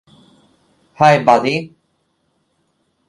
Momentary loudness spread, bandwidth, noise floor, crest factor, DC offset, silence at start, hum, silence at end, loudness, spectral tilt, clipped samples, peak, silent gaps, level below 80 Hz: 14 LU; 11.5 kHz; -65 dBFS; 18 dB; under 0.1%; 1 s; none; 1.4 s; -14 LUFS; -5.5 dB/octave; under 0.1%; 0 dBFS; none; -60 dBFS